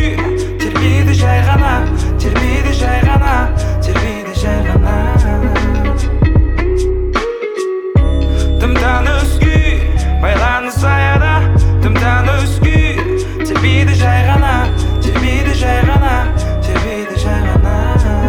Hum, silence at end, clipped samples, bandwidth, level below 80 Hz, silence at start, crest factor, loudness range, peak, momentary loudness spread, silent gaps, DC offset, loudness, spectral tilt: none; 0 s; under 0.1%; 13.5 kHz; -14 dBFS; 0 s; 10 dB; 2 LU; 0 dBFS; 6 LU; none; under 0.1%; -13 LUFS; -6.5 dB/octave